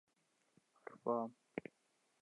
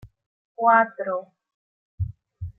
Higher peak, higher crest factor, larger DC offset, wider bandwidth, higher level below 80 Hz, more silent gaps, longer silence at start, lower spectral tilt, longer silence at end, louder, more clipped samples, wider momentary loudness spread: second, -24 dBFS vs -4 dBFS; about the same, 24 dB vs 22 dB; neither; first, 11 kHz vs 3.9 kHz; second, -90 dBFS vs -50 dBFS; second, none vs 0.26-0.55 s, 1.54-1.98 s; first, 0.9 s vs 0.05 s; second, -7.5 dB/octave vs -10.5 dB/octave; first, 0.6 s vs 0.05 s; second, -44 LUFS vs -23 LUFS; neither; first, 18 LU vs 15 LU